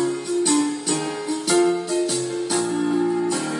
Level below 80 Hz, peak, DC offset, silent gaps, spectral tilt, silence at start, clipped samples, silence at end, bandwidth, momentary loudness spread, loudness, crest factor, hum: -72 dBFS; -8 dBFS; under 0.1%; none; -3.5 dB/octave; 0 s; under 0.1%; 0 s; 11.5 kHz; 5 LU; -22 LUFS; 14 dB; none